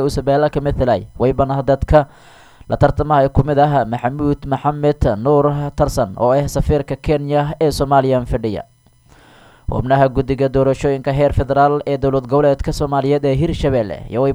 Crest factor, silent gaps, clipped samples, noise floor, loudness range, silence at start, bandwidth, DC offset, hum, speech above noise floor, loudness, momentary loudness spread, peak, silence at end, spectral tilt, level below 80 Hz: 16 dB; none; under 0.1%; -49 dBFS; 2 LU; 0 s; 13.5 kHz; under 0.1%; none; 34 dB; -16 LUFS; 5 LU; 0 dBFS; 0 s; -7.5 dB/octave; -30 dBFS